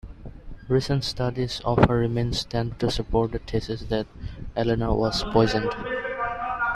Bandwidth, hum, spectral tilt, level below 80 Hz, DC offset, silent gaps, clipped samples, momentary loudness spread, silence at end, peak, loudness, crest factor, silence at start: 13 kHz; none; -6 dB/octave; -38 dBFS; under 0.1%; none; under 0.1%; 11 LU; 0 s; -2 dBFS; -25 LUFS; 22 dB; 0.05 s